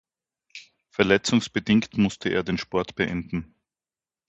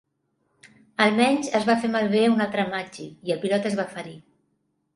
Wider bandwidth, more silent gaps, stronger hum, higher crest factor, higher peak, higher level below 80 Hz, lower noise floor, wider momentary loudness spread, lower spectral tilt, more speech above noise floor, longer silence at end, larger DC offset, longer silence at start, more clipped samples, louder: second, 8.4 kHz vs 11.5 kHz; neither; neither; about the same, 24 dB vs 22 dB; about the same, -2 dBFS vs -4 dBFS; first, -52 dBFS vs -68 dBFS; first, under -90 dBFS vs -72 dBFS; first, 22 LU vs 15 LU; about the same, -5 dB/octave vs -5 dB/octave; first, over 66 dB vs 49 dB; about the same, 0.85 s vs 0.75 s; neither; second, 0.55 s vs 1 s; neither; about the same, -24 LUFS vs -23 LUFS